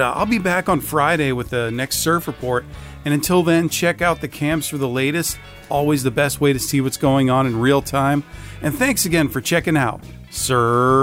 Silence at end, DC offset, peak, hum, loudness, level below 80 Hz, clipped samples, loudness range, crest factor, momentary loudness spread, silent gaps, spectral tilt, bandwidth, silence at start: 0 s; under 0.1%; -4 dBFS; none; -19 LUFS; -42 dBFS; under 0.1%; 2 LU; 14 dB; 8 LU; none; -5 dB/octave; 16 kHz; 0 s